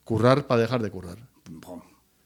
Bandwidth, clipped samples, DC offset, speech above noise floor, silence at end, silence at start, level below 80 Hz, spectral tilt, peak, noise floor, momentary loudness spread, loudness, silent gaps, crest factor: 15.5 kHz; under 0.1%; under 0.1%; 26 dB; 0.45 s; 0.1 s; -58 dBFS; -7 dB/octave; -6 dBFS; -49 dBFS; 24 LU; -23 LUFS; none; 20 dB